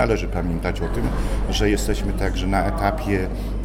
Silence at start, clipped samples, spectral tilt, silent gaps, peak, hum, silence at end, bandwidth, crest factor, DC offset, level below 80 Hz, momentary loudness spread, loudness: 0 s; under 0.1%; -5.5 dB/octave; none; -4 dBFS; none; 0 s; 16 kHz; 16 dB; under 0.1%; -24 dBFS; 4 LU; -23 LUFS